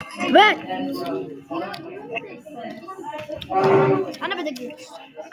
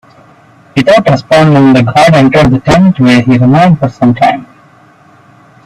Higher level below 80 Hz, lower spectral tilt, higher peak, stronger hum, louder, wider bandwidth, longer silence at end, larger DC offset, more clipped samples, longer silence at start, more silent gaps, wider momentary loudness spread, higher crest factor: second, -62 dBFS vs -36 dBFS; second, -5.5 dB/octave vs -7 dB/octave; second, -4 dBFS vs 0 dBFS; neither; second, -21 LUFS vs -6 LUFS; first, 16 kHz vs 12 kHz; second, 0.05 s vs 1.2 s; neither; second, under 0.1% vs 0.2%; second, 0 s vs 0.75 s; neither; first, 20 LU vs 5 LU; first, 20 dB vs 8 dB